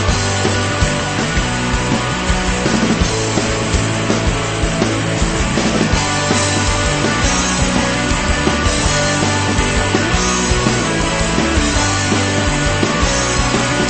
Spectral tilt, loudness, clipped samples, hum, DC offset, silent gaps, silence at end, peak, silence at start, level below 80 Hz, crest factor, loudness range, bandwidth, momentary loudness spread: -4 dB/octave; -15 LUFS; under 0.1%; none; 0.3%; none; 0 s; 0 dBFS; 0 s; -24 dBFS; 14 dB; 1 LU; 8.8 kHz; 2 LU